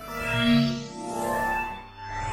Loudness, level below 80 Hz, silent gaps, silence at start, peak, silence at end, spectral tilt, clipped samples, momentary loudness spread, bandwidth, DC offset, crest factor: -26 LUFS; -46 dBFS; none; 0 s; -10 dBFS; 0 s; -5 dB/octave; under 0.1%; 13 LU; 16 kHz; under 0.1%; 16 dB